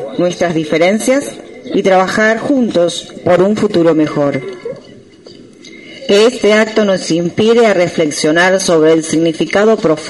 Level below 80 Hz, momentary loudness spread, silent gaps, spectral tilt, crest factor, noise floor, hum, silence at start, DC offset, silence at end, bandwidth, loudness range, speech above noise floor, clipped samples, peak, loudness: -52 dBFS; 10 LU; none; -4.5 dB/octave; 12 dB; -37 dBFS; none; 0 s; under 0.1%; 0 s; 11.5 kHz; 4 LU; 26 dB; under 0.1%; 0 dBFS; -12 LUFS